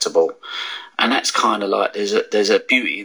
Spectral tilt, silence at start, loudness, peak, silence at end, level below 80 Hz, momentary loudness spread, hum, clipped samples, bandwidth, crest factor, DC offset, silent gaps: -2 dB/octave; 0 s; -18 LUFS; -2 dBFS; 0 s; -80 dBFS; 10 LU; none; under 0.1%; over 20 kHz; 16 dB; under 0.1%; none